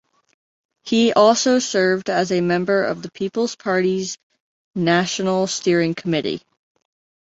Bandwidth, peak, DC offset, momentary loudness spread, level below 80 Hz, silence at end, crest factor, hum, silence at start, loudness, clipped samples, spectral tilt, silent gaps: 8.2 kHz; -2 dBFS; under 0.1%; 12 LU; -62 dBFS; 0.85 s; 18 dB; none; 0.85 s; -19 LUFS; under 0.1%; -4.5 dB/octave; 4.23-4.30 s, 4.40-4.73 s